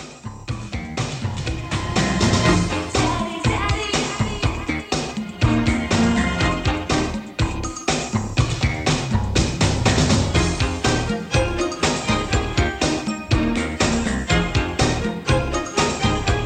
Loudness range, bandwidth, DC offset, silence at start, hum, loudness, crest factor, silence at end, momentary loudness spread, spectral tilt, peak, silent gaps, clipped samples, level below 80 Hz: 2 LU; 12.5 kHz; under 0.1%; 0 s; none; -21 LUFS; 18 dB; 0 s; 7 LU; -4.5 dB/octave; -4 dBFS; none; under 0.1%; -30 dBFS